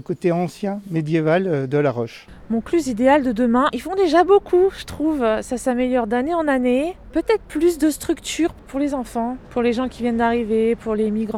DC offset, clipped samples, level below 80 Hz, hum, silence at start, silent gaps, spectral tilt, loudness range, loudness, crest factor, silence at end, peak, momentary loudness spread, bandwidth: under 0.1%; under 0.1%; -44 dBFS; none; 0.1 s; none; -6 dB/octave; 4 LU; -20 LUFS; 16 dB; 0 s; -4 dBFS; 8 LU; 15.5 kHz